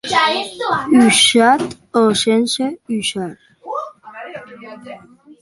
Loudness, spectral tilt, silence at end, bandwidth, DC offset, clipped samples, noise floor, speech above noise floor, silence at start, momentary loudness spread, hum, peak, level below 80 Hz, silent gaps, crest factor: -14 LUFS; -3 dB/octave; 0.1 s; 11.5 kHz; under 0.1%; under 0.1%; -40 dBFS; 25 dB; 0.05 s; 24 LU; none; 0 dBFS; -58 dBFS; none; 16 dB